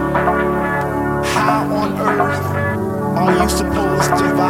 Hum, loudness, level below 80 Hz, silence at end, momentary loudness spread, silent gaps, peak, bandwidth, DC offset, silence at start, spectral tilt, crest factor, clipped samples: none; -17 LUFS; -34 dBFS; 0 s; 4 LU; none; -2 dBFS; 17 kHz; under 0.1%; 0 s; -5.5 dB/octave; 14 dB; under 0.1%